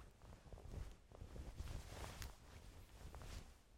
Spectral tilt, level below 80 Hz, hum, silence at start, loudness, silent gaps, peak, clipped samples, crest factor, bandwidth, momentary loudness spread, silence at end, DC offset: -4.5 dB/octave; -58 dBFS; none; 0 s; -57 LUFS; none; -28 dBFS; under 0.1%; 26 dB; 16 kHz; 9 LU; 0 s; under 0.1%